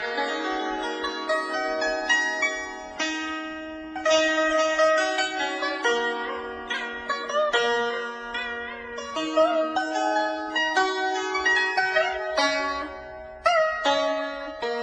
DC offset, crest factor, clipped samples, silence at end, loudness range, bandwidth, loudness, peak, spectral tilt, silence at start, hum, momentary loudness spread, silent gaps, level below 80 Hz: under 0.1%; 18 dB; under 0.1%; 0 s; 3 LU; 10 kHz; -25 LUFS; -6 dBFS; -1.5 dB/octave; 0 s; none; 11 LU; none; -58 dBFS